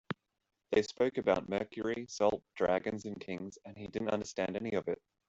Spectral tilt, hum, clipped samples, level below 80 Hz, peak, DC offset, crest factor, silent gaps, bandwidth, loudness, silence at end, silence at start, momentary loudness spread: -5.5 dB/octave; none; under 0.1%; -66 dBFS; -16 dBFS; under 0.1%; 20 dB; none; 8 kHz; -35 LUFS; 0.35 s; 0.1 s; 11 LU